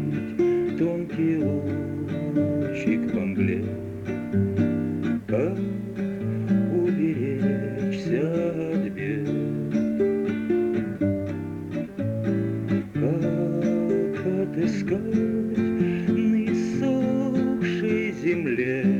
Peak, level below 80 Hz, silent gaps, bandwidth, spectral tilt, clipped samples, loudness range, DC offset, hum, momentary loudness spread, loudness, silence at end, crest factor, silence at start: -12 dBFS; -56 dBFS; none; 8 kHz; -8.5 dB/octave; under 0.1%; 2 LU; under 0.1%; none; 6 LU; -25 LUFS; 0 s; 12 dB; 0 s